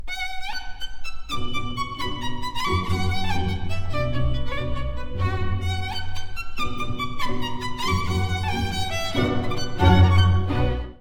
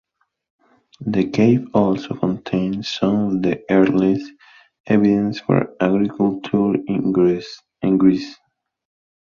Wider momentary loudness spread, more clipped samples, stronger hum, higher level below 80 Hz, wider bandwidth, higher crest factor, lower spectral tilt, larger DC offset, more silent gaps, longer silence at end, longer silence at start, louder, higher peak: first, 12 LU vs 9 LU; neither; neither; first, -32 dBFS vs -54 dBFS; first, 15 kHz vs 7.2 kHz; about the same, 18 dB vs 16 dB; second, -5.5 dB/octave vs -8 dB/octave; neither; second, none vs 4.80-4.84 s; second, 0.05 s vs 0.9 s; second, 0 s vs 1 s; second, -25 LUFS vs -19 LUFS; about the same, -4 dBFS vs -2 dBFS